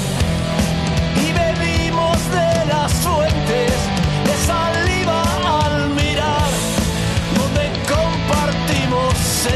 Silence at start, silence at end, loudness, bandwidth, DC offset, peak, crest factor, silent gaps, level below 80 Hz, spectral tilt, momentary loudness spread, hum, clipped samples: 0 s; 0 s; -17 LUFS; 13 kHz; under 0.1%; -6 dBFS; 12 dB; none; -26 dBFS; -4.5 dB/octave; 2 LU; none; under 0.1%